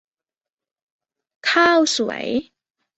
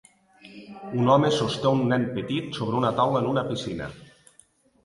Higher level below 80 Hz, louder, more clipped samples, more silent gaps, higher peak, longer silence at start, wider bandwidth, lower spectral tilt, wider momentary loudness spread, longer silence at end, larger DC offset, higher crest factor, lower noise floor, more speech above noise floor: second, -64 dBFS vs -58 dBFS; first, -18 LUFS vs -24 LUFS; neither; neither; first, -2 dBFS vs -6 dBFS; first, 1.45 s vs 0.45 s; second, 8.2 kHz vs 11.5 kHz; second, -2 dB/octave vs -6.5 dB/octave; second, 11 LU vs 17 LU; second, 0.55 s vs 0.8 s; neither; about the same, 20 dB vs 20 dB; first, under -90 dBFS vs -59 dBFS; first, over 72 dB vs 36 dB